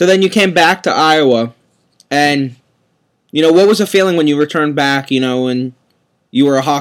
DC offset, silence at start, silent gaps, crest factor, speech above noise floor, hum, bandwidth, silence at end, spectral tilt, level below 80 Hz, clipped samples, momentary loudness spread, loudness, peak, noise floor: under 0.1%; 0 s; none; 12 dB; 50 dB; none; 16.5 kHz; 0 s; -4.5 dB/octave; -62 dBFS; under 0.1%; 10 LU; -12 LUFS; 0 dBFS; -61 dBFS